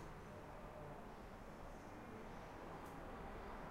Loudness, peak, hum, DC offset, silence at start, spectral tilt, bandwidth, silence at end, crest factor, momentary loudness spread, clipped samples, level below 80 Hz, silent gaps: -55 LUFS; -42 dBFS; none; under 0.1%; 0 s; -6 dB/octave; 16 kHz; 0 s; 12 dB; 3 LU; under 0.1%; -60 dBFS; none